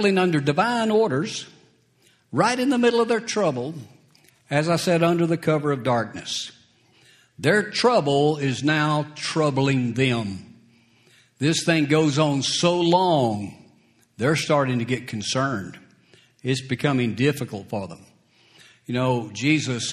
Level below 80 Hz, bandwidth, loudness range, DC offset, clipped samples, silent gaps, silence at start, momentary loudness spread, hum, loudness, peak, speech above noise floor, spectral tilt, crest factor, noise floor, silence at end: -62 dBFS; 14 kHz; 4 LU; under 0.1%; under 0.1%; none; 0 s; 12 LU; none; -22 LUFS; -4 dBFS; 39 dB; -5 dB/octave; 20 dB; -61 dBFS; 0 s